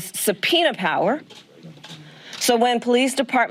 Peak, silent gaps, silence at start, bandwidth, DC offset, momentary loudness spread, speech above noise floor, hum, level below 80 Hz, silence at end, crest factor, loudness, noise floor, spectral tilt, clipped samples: -4 dBFS; none; 0 s; 16 kHz; under 0.1%; 22 LU; 22 dB; none; -70 dBFS; 0 s; 16 dB; -20 LUFS; -42 dBFS; -2.5 dB/octave; under 0.1%